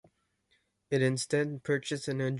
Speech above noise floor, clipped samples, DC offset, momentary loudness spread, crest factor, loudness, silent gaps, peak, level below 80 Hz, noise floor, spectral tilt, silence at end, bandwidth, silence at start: 44 dB; under 0.1%; under 0.1%; 5 LU; 18 dB; -31 LUFS; none; -16 dBFS; -70 dBFS; -74 dBFS; -5.5 dB/octave; 0 s; 11.5 kHz; 0.9 s